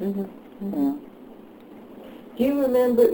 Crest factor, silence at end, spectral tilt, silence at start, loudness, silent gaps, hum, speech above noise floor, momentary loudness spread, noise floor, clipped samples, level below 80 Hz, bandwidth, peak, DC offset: 18 dB; 0 s; -7.5 dB/octave; 0 s; -24 LUFS; none; none; 23 dB; 25 LU; -45 dBFS; under 0.1%; -60 dBFS; over 20 kHz; -6 dBFS; under 0.1%